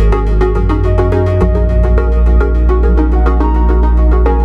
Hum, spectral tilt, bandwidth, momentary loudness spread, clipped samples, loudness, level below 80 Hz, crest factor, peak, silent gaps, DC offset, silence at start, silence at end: none; -10 dB/octave; 4.3 kHz; 2 LU; under 0.1%; -12 LUFS; -10 dBFS; 8 dB; 0 dBFS; none; 0.4%; 0 s; 0 s